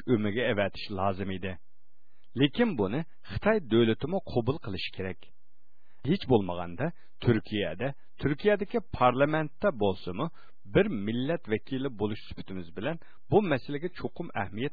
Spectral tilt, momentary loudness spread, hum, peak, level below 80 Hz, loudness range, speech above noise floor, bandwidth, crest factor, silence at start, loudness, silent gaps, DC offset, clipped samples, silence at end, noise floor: -9.5 dB/octave; 12 LU; none; -10 dBFS; -54 dBFS; 3 LU; 47 dB; 4.9 kHz; 20 dB; 0.05 s; -30 LUFS; none; 1%; under 0.1%; 0.05 s; -76 dBFS